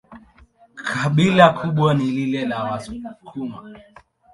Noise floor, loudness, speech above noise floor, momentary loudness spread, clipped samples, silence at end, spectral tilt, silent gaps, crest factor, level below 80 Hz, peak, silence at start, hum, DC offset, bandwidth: -52 dBFS; -19 LUFS; 33 dB; 20 LU; under 0.1%; 0.55 s; -6.5 dB/octave; none; 20 dB; -54 dBFS; 0 dBFS; 0.1 s; none; under 0.1%; 11.5 kHz